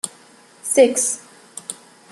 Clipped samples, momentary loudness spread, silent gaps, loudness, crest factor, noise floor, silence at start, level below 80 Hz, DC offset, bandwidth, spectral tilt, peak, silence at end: under 0.1%; 21 LU; none; -18 LUFS; 20 dB; -49 dBFS; 0.05 s; -74 dBFS; under 0.1%; 13 kHz; -1.5 dB/octave; -2 dBFS; 0.4 s